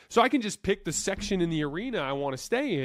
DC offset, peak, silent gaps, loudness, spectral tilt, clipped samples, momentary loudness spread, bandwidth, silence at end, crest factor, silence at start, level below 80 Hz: under 0.1%; -10 dBFS; none; -28 LUFS; -4 dB/octave; under 0.1%; 7 LU; 15.5 kHz; 0 s; 18 dB; 0.1 s; -50 dBFS